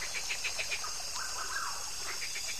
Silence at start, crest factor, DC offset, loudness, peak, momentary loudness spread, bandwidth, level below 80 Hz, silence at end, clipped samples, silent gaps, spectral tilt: 0 s; 18 dB; 0.8%; -35 LUFS; -20 dBFS; 3 LU; 14 kHz; -60 dBFS; 0 s; under 0.1%; none; 1 dB/octave